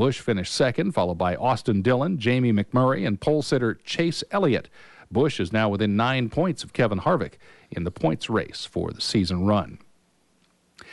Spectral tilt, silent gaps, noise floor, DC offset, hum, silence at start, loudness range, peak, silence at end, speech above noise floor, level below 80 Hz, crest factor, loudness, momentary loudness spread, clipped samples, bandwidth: -6 dB/octave; none; -65 dBFS; under 0.1%; none; 0 s; 4 LU; -10 dBFS; 0 s; 41 dB; -52 dBFS; 14 dB; -24 LUFS; 6 LU; under 0.1%; 11.5 kHz